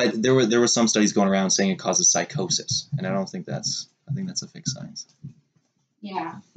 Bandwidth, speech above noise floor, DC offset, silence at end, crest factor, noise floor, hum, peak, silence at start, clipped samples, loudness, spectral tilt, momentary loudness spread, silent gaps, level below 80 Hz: 9.2 kHz; 45 dB; under 0.1%; 0.15 s; 16 dB; -69 dBFS; none; -8 dBFS; 0 s; under 0.1%; -22 LUFS; -3.5 dB/octave; 15 LU; none; -68 dBFS